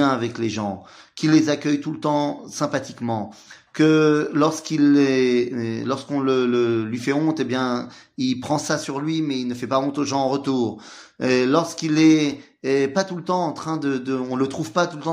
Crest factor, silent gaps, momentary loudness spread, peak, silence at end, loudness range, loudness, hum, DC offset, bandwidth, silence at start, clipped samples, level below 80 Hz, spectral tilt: 18 dB; none; 10 LU; -4 dBFS; 0 s; 4 LU; -21 LUFS; none; under 0.1%; 11.5 kHz; 0 s; under 0.1%; -66 dBFS; -5.5 dB/octave